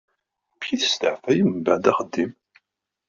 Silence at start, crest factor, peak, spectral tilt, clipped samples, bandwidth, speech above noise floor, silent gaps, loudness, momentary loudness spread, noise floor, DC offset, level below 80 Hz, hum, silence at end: 0.6 s; 20 dB; -4 dBFS; -3.5 dB/octave; under 0.1%; 7.6 kHz; 57 dB; none; -22 LUFS; 8 LU; -79 dBFS; under 0.1%; -64 dBFS; none; 0.8 s